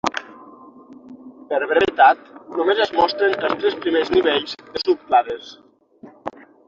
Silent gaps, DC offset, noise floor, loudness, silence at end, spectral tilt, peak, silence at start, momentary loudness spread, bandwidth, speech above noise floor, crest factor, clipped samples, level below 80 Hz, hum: none; under 0.1%; -46 dBFS; -19 LUFS; 0.4 s; -4 dB/octave; -2 dBFS; 0.05 s; 18 LU; 7.6 kHz; 27 dB; 20 dB; under 0.1%; -58 dBFS; none